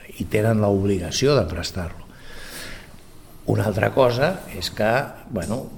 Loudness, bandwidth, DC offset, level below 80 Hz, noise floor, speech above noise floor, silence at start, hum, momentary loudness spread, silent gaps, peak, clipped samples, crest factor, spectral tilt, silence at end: -22 LUFS; 19.5 kHz; under 0.1%; -42 dBFS; -43 dBFS; 21 dB; 0 s; none; 18 LU; none; -2 dBFS; under 0.1%; 20 dB; -5.5 dB/octave; 0 s